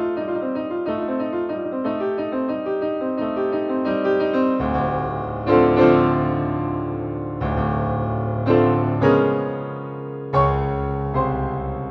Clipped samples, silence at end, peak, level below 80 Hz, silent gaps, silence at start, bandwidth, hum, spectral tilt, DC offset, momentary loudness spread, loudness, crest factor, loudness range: under 0.1%; 0 s; -2 dBFS; -38 dBFS; none; 0 s; 6 kHz; none; -10 dB/octave; under 0.1%; 9 LU; -21 LUFS; 18 dB; 5 LU